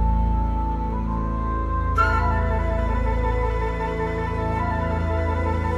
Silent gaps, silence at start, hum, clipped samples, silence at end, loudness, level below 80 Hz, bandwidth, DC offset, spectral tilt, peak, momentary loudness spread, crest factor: none; 0 s; none; under 0.1%; 0 s; -24 LUFS; -24 dBFS; 7.2 kHz; under 0.1%; -8.5 dB/octave; -6 dBFS; 5 LU; 16 dB